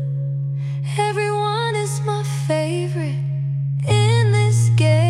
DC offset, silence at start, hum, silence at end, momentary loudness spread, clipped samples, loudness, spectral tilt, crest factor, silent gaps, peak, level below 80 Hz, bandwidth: under 0.1%; 0 s; none; 0 s; 8 LU; under 0.1%; -20 LUFS; -6 dB/octave; 12 dB; none; -6 dBFS; -54 dBFS; 12 kHz